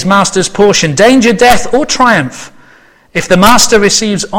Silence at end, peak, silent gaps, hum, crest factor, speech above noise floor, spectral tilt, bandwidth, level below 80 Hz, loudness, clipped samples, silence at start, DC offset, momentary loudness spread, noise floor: 0 s; 0 dBFS; none; none; 8 dB; 34 dB; -3.5 dB/octave; over 20 kHz; -32 dBFS; -7 LUFS; 2%; 0 s; under 0.1%; 9 LU; -42 dBFS